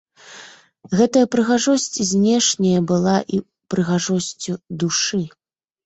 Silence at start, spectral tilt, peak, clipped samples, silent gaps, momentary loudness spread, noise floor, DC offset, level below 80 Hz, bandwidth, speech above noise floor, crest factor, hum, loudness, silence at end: 0.25 s; -4.5 dB/octave; -4 dBFS; under 0.1%; none; 12 LU; -44 dBFS; under 0.1%; -58 dBFS; 8.2 kHz; 26 dB; 16 dB; none; -19 LUFS; 0.55 s